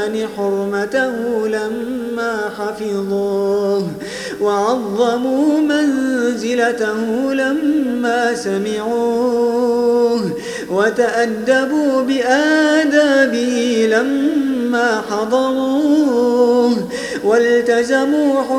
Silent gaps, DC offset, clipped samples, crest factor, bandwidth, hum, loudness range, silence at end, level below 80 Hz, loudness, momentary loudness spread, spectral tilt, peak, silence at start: none; under 0.1%; under 0.1%; 14 dB; 15 kHz; none; 5 LU; 0 s; -56 dBFS; -16 LUFS; 8 LU; -4.5 dB/octave; -2 dBFS; 0 s